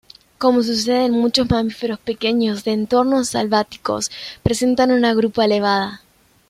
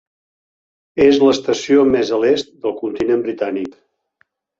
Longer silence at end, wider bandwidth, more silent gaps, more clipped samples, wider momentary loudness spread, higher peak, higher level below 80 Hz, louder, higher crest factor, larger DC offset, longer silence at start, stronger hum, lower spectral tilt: second, 0.5 s vs 0.9 s; first, 15 kHz vs 7.8 kHz; neither; neither; second, 8 LU vs 12 LU; about the same, -2 dBFS vs 0 dBFS; first, -46 dBFS vs -54 dBFS; about the same, -18 LUFS vs -16 LUFS; about the same, 16 dB vs 16 dB; neither; second, 0.4 s vs 0.95 s; neither; about the same, -4.5 dB/octave vs -5 dB/octave